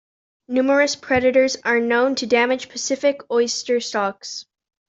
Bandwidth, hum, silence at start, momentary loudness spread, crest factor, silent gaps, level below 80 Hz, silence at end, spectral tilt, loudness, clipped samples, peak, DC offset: 8 kHz; none; 0.5 s; 8 LU; 16 dB; none; -58 dBFS; 0.45 s; -2.5 dB/octave; -19 LUFS; under 0.1%; -4 dBFS; under 0.1%